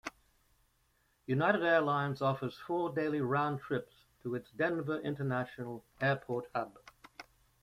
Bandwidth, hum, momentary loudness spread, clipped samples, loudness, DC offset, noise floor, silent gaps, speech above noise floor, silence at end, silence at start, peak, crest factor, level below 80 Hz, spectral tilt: 14.5 kHz; none; 17 LU; under 0.1%; -34 LUFS; under 0.1%; -74 dBFS; none; 40 dB; 0.4 s; 0.05 s; -16 dBFS; 20 dB; -70 dBFS; -7.5 dB/octave